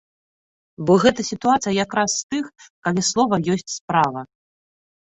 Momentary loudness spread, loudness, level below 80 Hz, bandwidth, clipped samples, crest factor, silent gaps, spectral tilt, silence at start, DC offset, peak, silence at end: 12 LU; -20 LUFS; -56 dBFS; 8.4 kHz; under 0.1%; 20 dB; 2.23-2.29 s, 2.70-2.82 s, 3.81-3.88 s; -4 dB/octave; 0.8 s; under 0.1%; -2 dBFS; 0.8 s